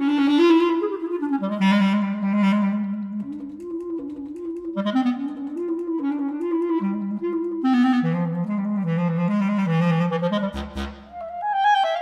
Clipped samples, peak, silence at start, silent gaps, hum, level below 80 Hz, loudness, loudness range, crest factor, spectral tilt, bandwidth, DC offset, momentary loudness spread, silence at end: under 0.1%; -8 dBFS; 0 s; none; none; -48 dBFS; -23 LUFS; 5 LU; 14 dB; -7.5 dB/octave; 8.6 kHz; under 0.1%; 13 LU; 0 s